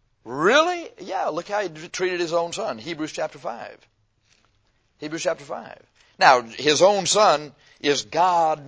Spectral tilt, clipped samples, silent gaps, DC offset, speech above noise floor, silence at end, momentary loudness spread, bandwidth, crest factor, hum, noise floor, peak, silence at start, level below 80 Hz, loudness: -2.5 dB/octave; under 0.1%; none; under 0.1%; 43 dB; 0 s; 17 LU; 8 kHz; 22 dB; none; -65 dBFS; -2 dBFS; 0.25 s; -66 dBFS; -21 LUFS